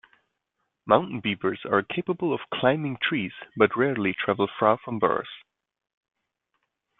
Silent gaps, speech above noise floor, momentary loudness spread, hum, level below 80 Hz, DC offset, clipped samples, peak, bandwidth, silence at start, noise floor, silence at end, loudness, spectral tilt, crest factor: none; 54 dB; 7 LU; none; -66 dBFS; under 0.1%; under 0.1%; -2 dBFS; 4.1 kHz; 0.85 s; -79 dBFS; 1.6 s; -25 LUFS; -9.5 dB/octave; 24 dB